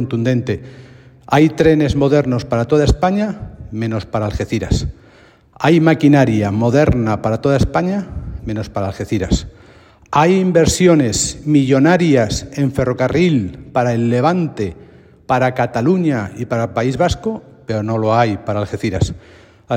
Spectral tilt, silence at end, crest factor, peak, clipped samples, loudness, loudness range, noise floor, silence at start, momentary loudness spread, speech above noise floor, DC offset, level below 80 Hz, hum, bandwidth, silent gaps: -6 dB/octave; 0 s; 16 dB; 0 dBFS; under 0.1%; -16 LUFS; 5 LU; -47 dBFS; 0 s; 11 LU; 32 dB; under 0.1%; -32 dBFS; none; 16 kHz; none